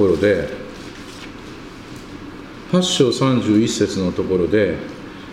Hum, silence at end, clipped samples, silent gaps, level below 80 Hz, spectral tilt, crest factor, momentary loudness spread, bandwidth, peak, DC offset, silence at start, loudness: none; 0 s; under 0.1%; none; -44 dBFS; -5 dB/octave; 18 dB; 19 LU; 15 kHz; -2 dBFS; under 0.1%; 0 s; -18 LUFS